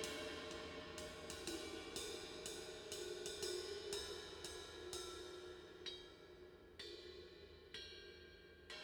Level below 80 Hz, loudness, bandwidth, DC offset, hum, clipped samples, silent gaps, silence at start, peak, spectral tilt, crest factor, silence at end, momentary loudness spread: -68 dBFS; -50 LUFS; over 20 kHz; under 0.1%; none; under 0.1%; none; 0 s; -26 dBFS; -2.5 dB/octave; 26 dB; 0 s; 13 LU